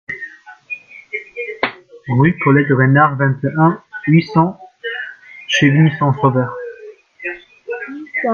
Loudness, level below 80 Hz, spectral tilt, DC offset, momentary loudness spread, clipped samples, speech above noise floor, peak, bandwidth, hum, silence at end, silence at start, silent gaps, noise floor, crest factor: -15 LUFS; -56 dBFS; -7 dB/octave; under 0.1%; 17 LU; under 0.1%; 26 dB; 0 dBFS; 6.8 kHz; none; 0 s; 0.1 s; none; -38 dBFS; 16 dB